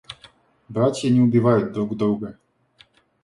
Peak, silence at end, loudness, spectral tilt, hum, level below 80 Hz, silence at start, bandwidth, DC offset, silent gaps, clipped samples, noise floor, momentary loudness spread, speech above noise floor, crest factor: -4 dBFS; 0.9 s; -20 LUFS; -7.5 dB/octave; none; -58 dBFS; 0.1 s; 11.5 kHz; under 0.1%; none; under 0.1%; -57 dBFS; 19 LU; 37 dB; 18 dB